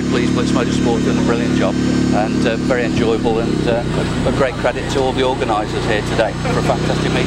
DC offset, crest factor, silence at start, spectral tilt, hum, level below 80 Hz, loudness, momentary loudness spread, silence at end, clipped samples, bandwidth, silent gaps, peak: under 0.1%; 16 dB; 0 s; -6 dB/octave; none; -32 dBFS; -16 LUFS; 2 LU; 0 s; under 0.1%; 12 kHz; none; 0 dBFS